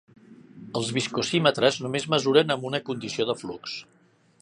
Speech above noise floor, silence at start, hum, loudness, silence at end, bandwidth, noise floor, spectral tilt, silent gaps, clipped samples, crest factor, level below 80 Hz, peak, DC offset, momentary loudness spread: 22 dB; 0.3 s; none; -25 LUFS; 0.6 s; 11 kHz; -47 dBFS; -4.5 dB/octave; none; under 0.1%; 22 dB; -68 dBFS; -4 dBFS; under 0.1%; 13 LU